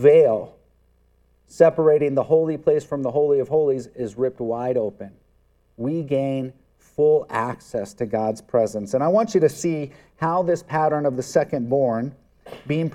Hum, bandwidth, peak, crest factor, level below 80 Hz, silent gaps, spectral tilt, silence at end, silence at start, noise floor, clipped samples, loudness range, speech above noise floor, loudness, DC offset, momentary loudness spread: none; 12.5 kHz; -2 dBFS; 20 dB; -60 dBFS; none; -7 dB/octave; 0 s; 0 s; -60 dBFS; under 0.1%; 5 LU; 40 dB; -21 LUFS; under 0.1%; 12 LU